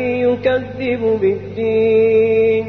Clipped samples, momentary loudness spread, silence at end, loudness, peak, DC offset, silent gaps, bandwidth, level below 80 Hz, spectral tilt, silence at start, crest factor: under 0.1%; 7 LU; 0 s; -16 LUFS; -4 dBFS; 0.2%; none; 4.5 kHz; -46 dBFS; -8.5 dB/octave; 0 s; 12 dB